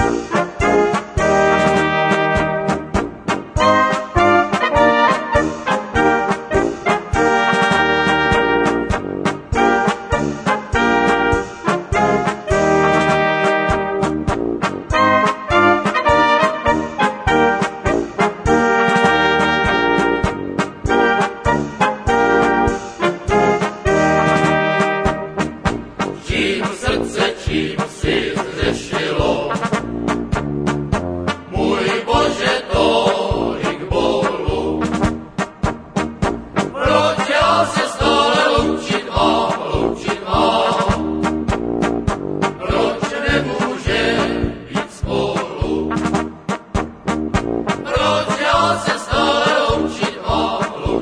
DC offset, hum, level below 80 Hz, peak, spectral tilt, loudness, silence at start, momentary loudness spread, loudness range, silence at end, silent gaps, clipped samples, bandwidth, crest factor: under 0.1%; none; -32 dBFS; 0 dBFS; -5 dB/octave; -17 LUFS; 0 s; 8 LU; 4 LU; 0 s; none; under 0.1%; 10.5 kHz; 16 dB